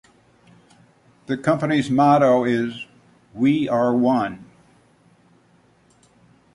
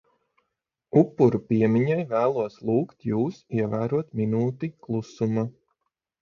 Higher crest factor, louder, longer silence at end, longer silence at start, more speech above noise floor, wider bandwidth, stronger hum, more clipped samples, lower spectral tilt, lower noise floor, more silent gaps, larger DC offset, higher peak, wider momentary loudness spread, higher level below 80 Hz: about the same, 18 dB vs 20 dB; first, -19 LUFS vs -25 LUFS; first, 2.1 s vs 0.7 s; first, 1.3 s vs 0.95 s; second, 39 dB vs 57 dB; first, 11 kHz vs 7 kHz; neither; neither; second, -7 dB/octave vs -9.5 dB/octave; second, -57 dBFS vs -81 dBFS; neither; neither; about the same, -4 dBFS vs -6 dBFS; first, 19 LU vs 8 LU; about the same, -62 dBFS vs -62 dBFS